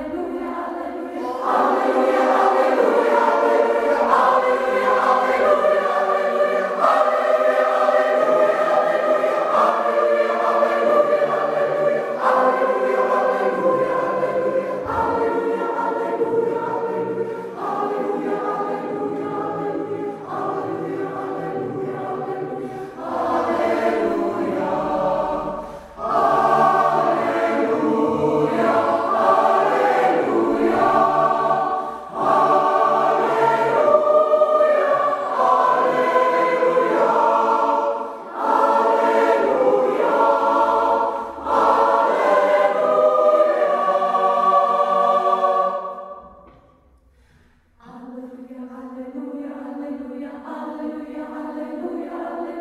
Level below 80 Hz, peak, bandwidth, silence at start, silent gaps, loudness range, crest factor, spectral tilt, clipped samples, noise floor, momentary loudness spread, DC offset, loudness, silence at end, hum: -58 dBFS; -2 dBFS; 13 kHz; 0 s; none; 9 LU; 18 dB; -5.5 dB/octave; under 0.1%; -55 dBFS; 13 LU; under 0.1%; -19 LUFS; 0 s; none